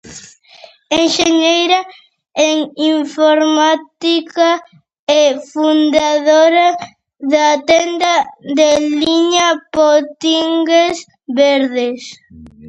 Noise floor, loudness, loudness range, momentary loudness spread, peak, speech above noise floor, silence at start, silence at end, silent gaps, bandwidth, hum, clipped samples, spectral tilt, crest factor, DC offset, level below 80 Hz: -42 dBFS; -13 LUFS; 2 LU; 10 LU; 0 dBFS; 29 dB; 0.05 s; 0 s; 4.99-5.07 s; 8.8 kHz; none; under 0.1%; -2 dB/octave; 14 dB; under 0.1%; -54 dBFS